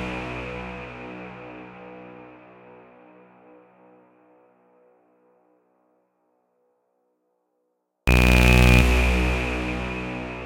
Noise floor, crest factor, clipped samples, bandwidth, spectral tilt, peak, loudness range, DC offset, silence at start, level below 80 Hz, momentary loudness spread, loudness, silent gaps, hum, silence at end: -74 dBFS; 22 dB; under 0.1%; 17 kHz; -5.5 dB/octave; -4 dBFS; 23 LU; under 0.1%; 0 s; -28 dBFS; 26 LU; -21 LUFS; none; none; 0 s